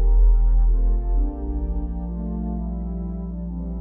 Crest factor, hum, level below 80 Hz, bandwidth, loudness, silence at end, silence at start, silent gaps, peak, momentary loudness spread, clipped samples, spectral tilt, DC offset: 12 dB; none; -20 dBFS; 1.4 kHz; -25 LUFS; 0 s; 0 s; none; -8 dBFS; 10 LU; under 0.1%; -14 dB/octave; under 0.1%